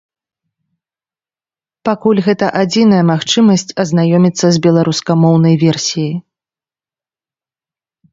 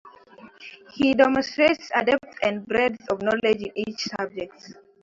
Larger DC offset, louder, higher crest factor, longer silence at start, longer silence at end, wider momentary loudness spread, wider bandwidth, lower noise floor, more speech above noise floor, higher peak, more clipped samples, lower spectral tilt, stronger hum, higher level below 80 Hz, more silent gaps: neither; first, -12 LUFS vs -23 LUFS; second, 14 dB vs 20 dB; first, 1.85 s vs 0.05 s; first, 1.9 s vs 0.3 s; second, 7 LU vs 18 LU; about the same, 7.8 kHz vs 7.8 kHz; first, under -90 dBFS vs -49 dBFS; first, over 79 dB vs 25 dB; first, 0 dBFS vs -4 dBFS; neither; first, -6 dB/octave vs -4.5 dB/octave; neither; about the same, -56 dBFS vs -60 dBFS; neither